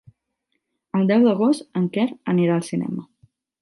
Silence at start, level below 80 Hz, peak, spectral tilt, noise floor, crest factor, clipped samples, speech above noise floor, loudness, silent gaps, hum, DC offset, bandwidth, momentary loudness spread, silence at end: 0.95 s; -70 dBFS; -6 dBFS; -7.5 dB/octave; -76 dBFS; 16 dB; under 0.1%; 56 dB; -21 LUFS; none; none; under 0.1%; 11.5 kHz; 10 LU; 0.6 s